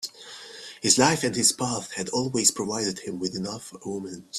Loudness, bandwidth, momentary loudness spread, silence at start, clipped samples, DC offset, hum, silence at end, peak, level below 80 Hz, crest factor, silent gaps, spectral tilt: -24 LUFS; 15 kHz; 17 LU; 0 s; under 0.1%; under 0.1%; none; 0 s; -4 dBFS; -64 dBFS; 22 dB; none; -2.5 dB/octave